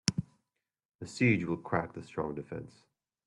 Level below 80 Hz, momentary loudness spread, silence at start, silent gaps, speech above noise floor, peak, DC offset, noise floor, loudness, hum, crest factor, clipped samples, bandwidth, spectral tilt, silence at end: -66 dBFS; 17 LU; 0.05 s; 0.85-0.89 s, 0.95-0.99 s; 53 dB; -8 dBFS; under 0.1%; -86 dBFS; -33 LUFS; none; 28 dB; under 0.1%; 11.5 kHz; -5 dB/octave; 0.55 s